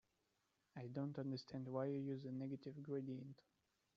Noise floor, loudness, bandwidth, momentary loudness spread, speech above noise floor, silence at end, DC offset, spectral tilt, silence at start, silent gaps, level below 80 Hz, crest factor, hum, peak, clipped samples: -86 dBFS; -48 LUFS; 7.2 kHz; 12 LU; 38 dB; 0.65 s; under 0.1%; -7.5 dB/octave; 0.75 s; none; -88 dBFS; 18 dB; none; -30 dBFS; under 0.1%